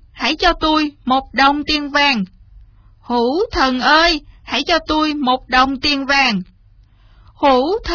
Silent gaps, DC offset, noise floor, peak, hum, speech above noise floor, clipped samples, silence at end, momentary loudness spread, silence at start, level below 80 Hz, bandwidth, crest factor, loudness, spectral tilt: none; under 0.1%; -48 dBFS; 0 dBFS; none; 33 dB; under 0.1%; 0 s; 8 LU; 0.15 s; -36 dBFS; 5.4 kHz; 16 dB; -15 LUFS; -4 dB/octave